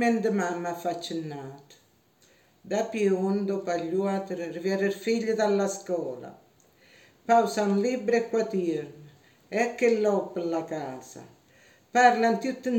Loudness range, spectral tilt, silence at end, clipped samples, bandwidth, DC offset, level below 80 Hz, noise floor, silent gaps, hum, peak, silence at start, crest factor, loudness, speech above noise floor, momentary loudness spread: 4 LU; -5.5 dB/octave; 0 s; under 0.1%; 17 kHz; under 0.1%; -76 dBFS; -63 dBFS; none; none; -6 dBFS; 0 s; 22 dB; -27 LUFS; 36 dB; 15 LU